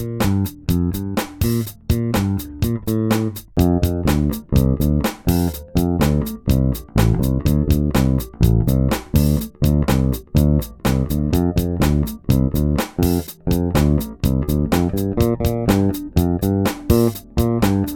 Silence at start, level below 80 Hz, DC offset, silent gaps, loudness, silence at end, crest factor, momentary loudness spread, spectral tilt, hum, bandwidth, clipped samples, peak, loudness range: 0 s; -26 dBFS; under 0.1%; none; -19 LUFS; 0 s; 18 dB; 4 LU; -7 dB/octave; none; 18 kHz; under 0.1%; 0 dBFS; 2 LU